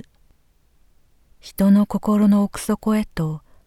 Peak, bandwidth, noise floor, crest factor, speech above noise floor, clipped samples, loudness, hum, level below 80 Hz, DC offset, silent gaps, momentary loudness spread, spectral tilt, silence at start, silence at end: -6 dBFS; 16.5 kHz; -58 dBFS; 14 dB; 40 dB; under 0.1%; -19 LUFS; none; -46 dBFS; under 0.1%; none; 10 LU; -7 dB/octave; 1.45 s; 0.3 s